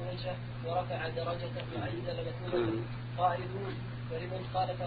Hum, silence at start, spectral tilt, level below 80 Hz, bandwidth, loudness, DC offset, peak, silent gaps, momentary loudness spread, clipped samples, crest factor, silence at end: none; 0 s; -5.5 dB/octave; -54 dBFS; 4.9 kHz; -36 LUFS; under 0.1%; -16 dBFS; none; 7 LU; under 0.1%; 20 dB; 0 s